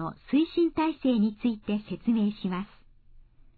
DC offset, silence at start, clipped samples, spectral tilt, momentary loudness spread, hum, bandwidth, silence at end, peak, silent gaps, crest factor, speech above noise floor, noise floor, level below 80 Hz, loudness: under 0.1%; 0 s; under 0.1%; -10.5 dB/octave; 7 LU; none; 4.7 kHz; 0.9 s; -14 dBFS; none; 14 dB; 27 dB; -54 dBFS; -56 dBFS; -28 LUFS